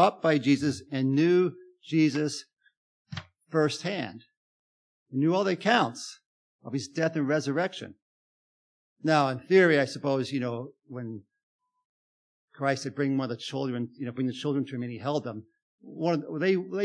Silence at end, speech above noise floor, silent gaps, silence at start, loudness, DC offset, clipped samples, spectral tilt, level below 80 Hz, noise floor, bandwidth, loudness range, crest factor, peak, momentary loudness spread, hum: 0 s; over 63 dB; 2.77-3.05 s, 4.37-5.06 s, 6.26-6.59 s, 8.02-8.96 s, 11.43-11.59 s, 11.85-12.48 s, 15.62-15.78 s; 0 s; -27 LUFS; under 0.1%; under 0.1%; -6 dB/octave; -76 dBFS; under -90 dBFS; 10.5 kHz; 6 LU; 20 dB; -8 dBFS; 17 LU; none